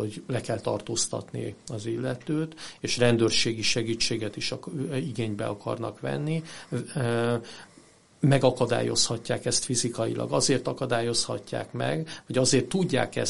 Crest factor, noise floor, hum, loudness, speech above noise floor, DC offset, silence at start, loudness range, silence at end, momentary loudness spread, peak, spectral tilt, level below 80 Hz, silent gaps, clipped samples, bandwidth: 22 dB; -56 dBFS; none; -27 LUFS; 28 dB; 0.4%; 0 s; 5 LU; 0 s; 10 LU; -6 dBFS; -4 dB/octave; -56 dBFS; none; under 0.1%; 11.5 kHz